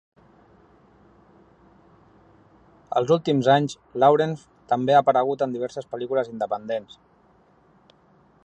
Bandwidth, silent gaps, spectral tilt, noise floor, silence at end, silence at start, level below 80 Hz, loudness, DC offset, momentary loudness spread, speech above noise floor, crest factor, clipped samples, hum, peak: 9 kHz; none; -6.5 dB/octave; -58 dBFS; 1.6 s; 2.9 s; -66 dBFS; -22 LUFS; under 0.1%; 13 LU; 36 dB; 20 dB; under 0.1%; none; -4 dBFS